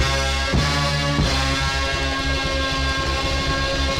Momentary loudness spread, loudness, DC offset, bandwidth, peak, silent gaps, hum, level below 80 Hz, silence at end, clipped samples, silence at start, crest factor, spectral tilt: 2 LU; -20 LUFS; under 0.1%; 15.5 kHz; -6 dBFS; none; none; -26 dBFS; 0 s; under 0.1%; 0 s; 14 dB; -4 dB/octave